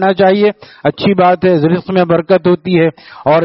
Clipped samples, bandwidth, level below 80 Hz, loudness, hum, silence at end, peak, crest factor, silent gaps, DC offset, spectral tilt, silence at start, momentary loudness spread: under 0.1%; 5.8 kHz; -50 dBFS; -12 LUFS; none; 0 s; 0 dBFS; 12 dB; none; under 0.1%; -5.5 dB/octave; 0 s; 6 LU